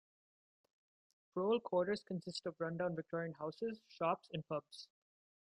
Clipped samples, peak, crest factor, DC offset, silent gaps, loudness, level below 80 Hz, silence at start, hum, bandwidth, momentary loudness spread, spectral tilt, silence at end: under 0.1%; -24 dBFS; 20 dB; under 0.1%; none; -41 LUFS; -82 dBFS; 1.35 s; none; 11.5 kHz; 9 LU; -6.5 dB/octave; 0.65 s